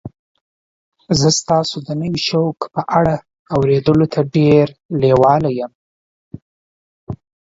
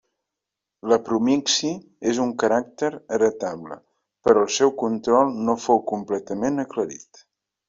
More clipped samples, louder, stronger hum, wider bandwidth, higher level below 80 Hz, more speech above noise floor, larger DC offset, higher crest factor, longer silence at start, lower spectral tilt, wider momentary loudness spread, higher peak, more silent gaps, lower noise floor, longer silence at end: neither; first, -16 LUFS vs -22 LUFS; neither; about the same, 7.8 kHz vs 7.8 kHz; first, -46 dBFS vs -62 dBFS; first, over 75 dB vs 63 dB; neither; about the same, 16 dB vs 20 dB; second, 0.05 s vs 0.85 s; first, -5.5 dB/octave vs -4 dB/octave; about the same, 13 LU vs 11 LU; first, 0 dBFS vs -4 dBFS; first, 0.19-0.35 s, 0.41-0.92 s, 3.39-3.45 s, 4.85-4.89 s, 5.75-6.31 s, 6.42-7.07 s vs none; first, under -90 dBFS vs -85 dBFS; second, 0.3 s vs 0.7 s